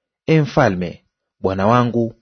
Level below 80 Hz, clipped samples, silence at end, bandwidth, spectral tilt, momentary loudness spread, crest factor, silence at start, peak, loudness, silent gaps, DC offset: -48 dBFS; under 0.1%; 0.1 s; 6.6 kHz; -7.5 dB/octave; 10 LU; 18 dB; 0.3 s; 0 dBFS; -17 LUFS; none; under 0.1%